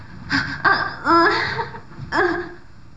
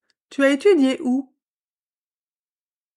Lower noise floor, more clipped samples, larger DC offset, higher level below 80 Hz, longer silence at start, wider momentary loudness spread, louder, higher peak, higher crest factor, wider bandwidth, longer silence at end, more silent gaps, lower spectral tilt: second, -41 dBFS vs under -90 dBFS; neither; first, 0.9% vs under 0.1%; first, -48 dBFS vs -78 dBFS; second, 0 s vs 0.3 s; first, 15 LU vs 10 LU; about the same, -19 LUFS vs -19 LUFS; about the same, -4 dBFS vs -6 dBFS; about the same, 18 dB vs 18 dB; second, 8 kHz vs 11 kHz; second, 0.1 s vs 1.75 s; neither; first, -5 dB/octave vs -3.5 dB/octave